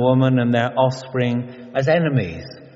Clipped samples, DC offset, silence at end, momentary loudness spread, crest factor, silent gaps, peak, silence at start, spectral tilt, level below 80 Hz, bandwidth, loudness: under 0.1%; under 0.1%; 0.1 s; 10 LU; 16 dB; none; -4 dBFS; 0 s; -6.5 dB/octave; -56 dBFS; 7.6 kHz; -20 LUFS